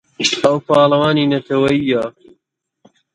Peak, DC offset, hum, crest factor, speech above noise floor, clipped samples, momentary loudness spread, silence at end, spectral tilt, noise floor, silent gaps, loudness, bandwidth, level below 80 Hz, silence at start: 0 dBFS; under 0.1%; none; 16 dB; 41 dB; under 0.1%; 6 LU; 1.05 s; -5 dB/octave; -55 dBFS; none; -15 LUFS; 11.5 kHz; -54 dBFS; 0.2 s